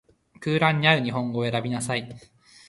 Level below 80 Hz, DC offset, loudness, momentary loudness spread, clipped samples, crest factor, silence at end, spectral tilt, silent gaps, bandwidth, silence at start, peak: -60 dBFS; under 0.1%; -24 LUFS; 11 LU; under 0.1%; 24 dB; 0.5 s; -5 dB/octave; none; 11.5 kHz; 0.4 s; -2 dBFS